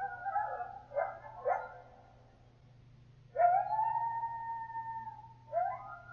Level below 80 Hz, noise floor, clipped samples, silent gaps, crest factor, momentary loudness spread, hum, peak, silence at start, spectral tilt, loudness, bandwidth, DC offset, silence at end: -68 dBFS; -61 dBFS; under 0.1%; none; 20 dB; 15 LU; none; -16 dBFS; 0 s; -4.5 dB/octave; -36 LUFS; 6 kHz; under 0.1%; 0 s